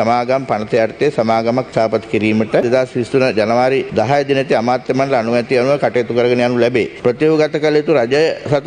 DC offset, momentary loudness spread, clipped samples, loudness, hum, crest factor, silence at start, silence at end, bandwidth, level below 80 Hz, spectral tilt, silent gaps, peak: under 0.1%; 3 LU; under 0.1%; -15 LUFS; none; 14 dB; 0 s; 0 s; 9.8 kHz; -52 dBFS; -6.5 dB/octave; none; 0 dBFS